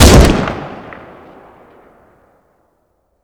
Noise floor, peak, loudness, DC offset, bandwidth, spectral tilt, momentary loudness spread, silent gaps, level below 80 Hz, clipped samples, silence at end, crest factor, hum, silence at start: -61 dBFS; 0 dBFS; -11 LUFS; under 0.1%; over 20 kHz; -5 dB/octave; 27 LU; none; -18 dBFS; 0.7%; 2.4 s; 14 dB; none; 0 s